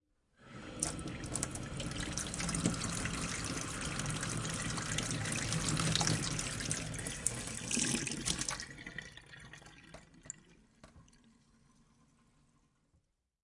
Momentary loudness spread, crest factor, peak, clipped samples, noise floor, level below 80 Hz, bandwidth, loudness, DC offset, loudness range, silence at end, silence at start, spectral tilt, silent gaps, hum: 19 LU; 30 dB; -10 dBFS; under 0.1%; -76 dBFS; -54 dBFS; 11.5 kHz; -36 LUFS; under 0.1%; 18 LU; 2.45 s; 0.4 s; -3 dB/octave; none; none